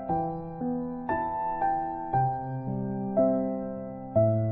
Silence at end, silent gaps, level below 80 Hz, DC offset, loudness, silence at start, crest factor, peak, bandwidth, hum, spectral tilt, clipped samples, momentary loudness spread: 0 s; none; -54 dBFS; under 0.1%; -29 LUFS; 0 s; 16 dB; -12 dBFS; 3.8 kHz; none; -10.5 dB/octave; under 0.1%; 9 LU